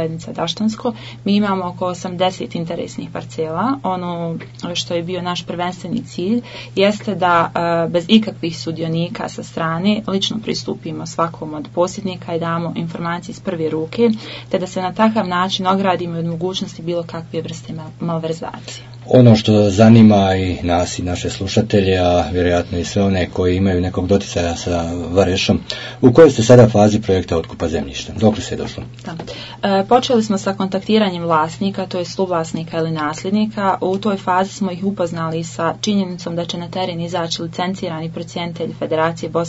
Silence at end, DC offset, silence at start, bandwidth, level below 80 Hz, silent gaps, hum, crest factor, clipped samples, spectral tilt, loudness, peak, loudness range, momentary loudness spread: 0 s; under 0.1%; 0 s; 8 kHz; -46 dBFS; none; none; 16 dB; under 0.1%; -6 dB/octave; -17 LUFS; 0 dBFS; 9 LU; 12 LU